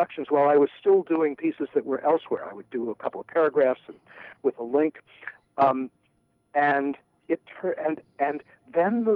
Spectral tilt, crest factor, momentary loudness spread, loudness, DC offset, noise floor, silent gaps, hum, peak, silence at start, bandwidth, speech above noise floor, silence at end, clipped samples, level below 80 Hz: -9 dB/octave; 16 dB; 15 LU; -25 LUFS; under 0.1%; -68 dBFS; none; none; -10 dBFS; 0 s; 5 kHz; 44 dB; 0 s; under 0.1%; -78 dBFS